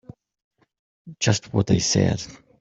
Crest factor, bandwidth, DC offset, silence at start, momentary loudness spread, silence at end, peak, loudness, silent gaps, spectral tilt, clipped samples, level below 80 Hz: 22 dB; 8.2 kHz; under 0.1%; 1.05 s; 10 LU; 0.25 s; -4 dBFS; -22 LUFS; none; -4.5 dB/octave; under 0.1%; -50 dBFS